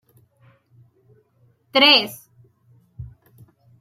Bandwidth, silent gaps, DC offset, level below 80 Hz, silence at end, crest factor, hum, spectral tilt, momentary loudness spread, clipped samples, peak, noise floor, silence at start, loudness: 16 kHz; none; under 0.1%; -56 dBFS; 0.8 s; 24 dB; none; -3 dB/octave; 29 LU; under 0.1%; -2 dBFS; -61 dBFS; 1.75 s; -15 LUFS